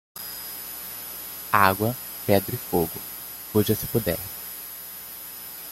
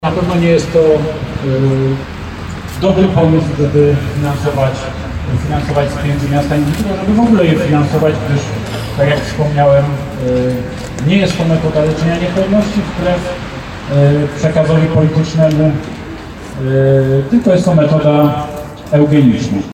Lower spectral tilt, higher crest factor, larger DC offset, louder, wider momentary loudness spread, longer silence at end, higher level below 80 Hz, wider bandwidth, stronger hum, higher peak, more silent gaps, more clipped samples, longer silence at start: second, -4.5 dB/octave vs -7.5 dB/octave; first, 24 dB vs 12 dB; neither; second, -26 LUFS vs -13 LUFS; first, 15 LU vs 11 LU; about the same, 0 s vs 0 s; second, -54 dBFS vs -30 dBFS; about the same, 17 kHz vs 15.5 kHz; first, 60 Hz at -50 dBFS vs none; about the same, -2 dBFS vs 0 dBFS; neither; neither; first, 0.15 s vs 0 s